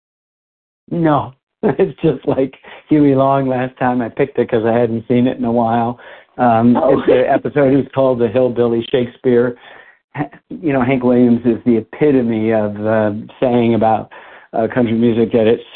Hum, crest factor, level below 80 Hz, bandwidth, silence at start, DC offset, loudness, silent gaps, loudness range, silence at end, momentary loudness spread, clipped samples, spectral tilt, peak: none; 14 dB; -48 dBFS; 4.2 kHz; 0.9 s; under 0.1%; -15 LUFS; 1.43-1.47 s, 10.04-10.08 s; 2 LU; 0.1 s; 10 LU; under 0.1%; -13 dB/octave; 0 dBFS